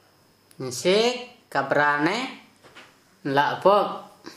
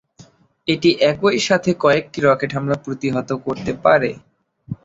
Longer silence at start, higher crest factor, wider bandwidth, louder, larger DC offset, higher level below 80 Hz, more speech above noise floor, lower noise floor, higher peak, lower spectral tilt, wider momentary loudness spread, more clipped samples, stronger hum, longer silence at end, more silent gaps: about the same, 0.6 s vs 0.65 s; about the same, 20 dB vs 18 dB; first, 15 kHz vs 8 kHz; second, -23 LUFS vs -18 LUFS; neither; second, -74 dBFS vs -52 dBFS; first, 37 dB vs 31 dB; first, -59 dBFS vs -49 dBFS; second, -4 dBFS vs 0 dBFS; second, -4 dB/octave vs -5.5 dB/octave; first, 15 LU vs 9 LU; neither; neither; about the same, 0.05 s vs 0.1 s; neither